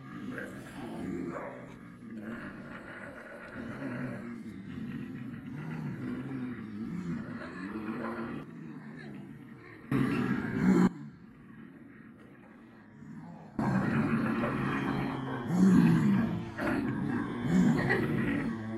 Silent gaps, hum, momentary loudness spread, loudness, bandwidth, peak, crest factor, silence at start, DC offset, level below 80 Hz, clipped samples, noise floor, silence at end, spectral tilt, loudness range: none; none; 21 LU; -32 LUFS; 12.5 kHz; -12 dBFS; 22 dB; 0 s; under 0.1%; -58 dBFS; under 0.1%; -53 dBFS; 0 s; -8 dB/octave; 13 LU